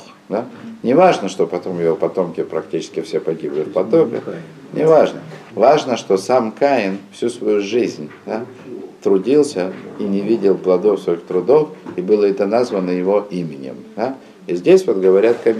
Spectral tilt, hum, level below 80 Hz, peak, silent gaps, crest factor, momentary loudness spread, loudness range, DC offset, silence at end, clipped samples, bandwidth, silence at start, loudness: -6.5 dB/octave; none; -68 dBFS; -2 dBFS; none; 16 dB; 13 LU; 3 LU; under 0.1%; 0 s; under 0.1%; 12 kHz; 0 s; -17 LUFS